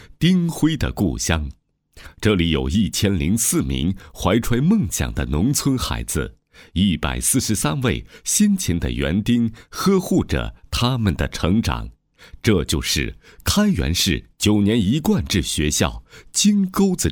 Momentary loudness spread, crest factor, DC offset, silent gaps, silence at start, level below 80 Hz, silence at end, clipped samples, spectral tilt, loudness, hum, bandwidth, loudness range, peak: 7 LU; 20 dB; under 0.1%; none; 0 s; -32 dBFS; 0 s; under 0.1%; -4.5 dB/octave; -20 LUFS; none; 20 kHz; 2 LU; 0 dBFS